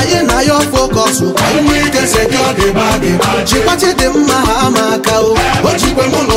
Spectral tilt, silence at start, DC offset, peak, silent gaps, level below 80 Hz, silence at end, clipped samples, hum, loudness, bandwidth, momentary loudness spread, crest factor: -4 dB/octave; 0 s; under 0.1%; 0 dBFS; none; -26 dBFS; 0 s; under 0.1%; none; -10 LUFS; 16.5 kHz; 1 LU; 10 dB